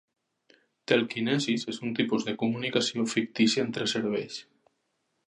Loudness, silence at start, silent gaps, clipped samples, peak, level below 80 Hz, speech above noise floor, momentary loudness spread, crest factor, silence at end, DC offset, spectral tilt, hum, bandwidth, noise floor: -28 LUFS; 0.9 s; none; under 0.1%; -6 dBFS; -74 dBFS; 49 dB; 7 LU; 24 dB; 0.85 s; under 0.1%; -4 dB/octave; none; 10.5 kHz; -77 dBFS